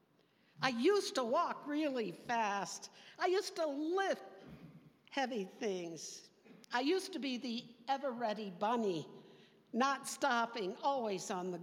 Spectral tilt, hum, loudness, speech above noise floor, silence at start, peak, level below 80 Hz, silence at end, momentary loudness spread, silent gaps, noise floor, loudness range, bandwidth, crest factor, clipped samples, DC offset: -3.5 dB/octave; none; -38 LUFS; 35 dB; 0.6 s; -16 dBFS; -86 dBFS; 0 s; 11 LU; none; -72 dBFS; 4 LU; 16.5 kHz; 22 dB; under 0.1%; under 0.1%